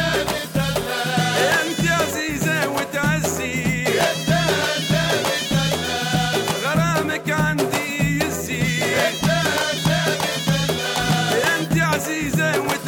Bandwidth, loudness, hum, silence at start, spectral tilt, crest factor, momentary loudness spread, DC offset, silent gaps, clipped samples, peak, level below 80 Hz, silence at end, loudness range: 18 kHz; -20 LUFS; none; 0 s; -4 dB/octave; 12 dB; 4 LU; under 0.1%; none; under 0.1%; -8 dBFS; -42 dBFS; 0 s; 1 LU